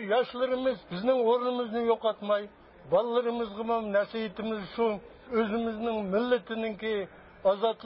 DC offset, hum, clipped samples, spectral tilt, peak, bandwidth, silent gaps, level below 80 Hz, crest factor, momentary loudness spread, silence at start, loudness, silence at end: under 0.1%; none; under 0.1%; -9.5 dB/octave; -14 dBFS; 5.6 kHz; none; -62 dBFS; 14 dB; 7 LU; 0 s; -29 LUFS; 0 s